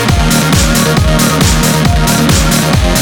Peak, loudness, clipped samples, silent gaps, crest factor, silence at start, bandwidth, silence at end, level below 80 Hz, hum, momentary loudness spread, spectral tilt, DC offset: 0 dBFS; -9 LUFS; under 0.1%; none; 8 dB; 0 s; over 20 kHz; 0 s; -16 dBFS; none; 1 LU; -4 dB/octave; under 0.1%